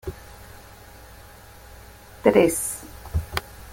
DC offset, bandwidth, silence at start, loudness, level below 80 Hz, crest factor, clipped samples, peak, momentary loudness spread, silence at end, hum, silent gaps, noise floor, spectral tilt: under 0.1%; 17 kHz; 0.05 s; -23 LUFS; -42 dBFS; 24 dB; under 0.1%; -2 dBFS; 27 LU; 0 s; none; none; -46 dBFS; -4.5 dB/octave